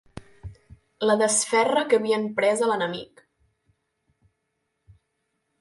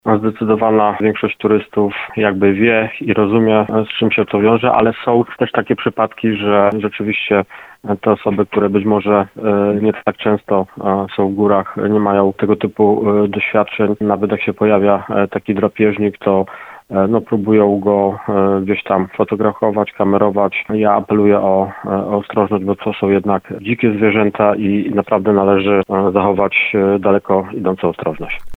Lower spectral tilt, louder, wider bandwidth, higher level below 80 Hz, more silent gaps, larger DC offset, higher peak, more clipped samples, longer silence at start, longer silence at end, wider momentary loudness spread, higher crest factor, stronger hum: second, -3 dB/octave vs -9 dB/octave; second, -22 LUFS vs -15 LUFS; first, 11.5 kHz vs 4.1 kHz; second, -58 dBFS vs -50 dBFS; neither; neither; second, -8 dBFS vs 0 dBFS; neither; about the same, 0.15 s vs 0.05 s; first, 2.55 s vs 0 s; first, 23 LU vs 6 LU; about the same, 18 dB vs 14 dB; neither